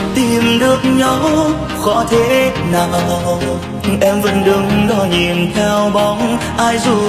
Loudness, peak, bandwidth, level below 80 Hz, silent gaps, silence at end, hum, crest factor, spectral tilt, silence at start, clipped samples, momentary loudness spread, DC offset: -13 LUFS; 0 dBFS; 15 kHz; -34 dBFS; none; 0 s; none; 14 dB; -5 dB/octave; 0 s; under 0.1%; 5 LU; under 0.1%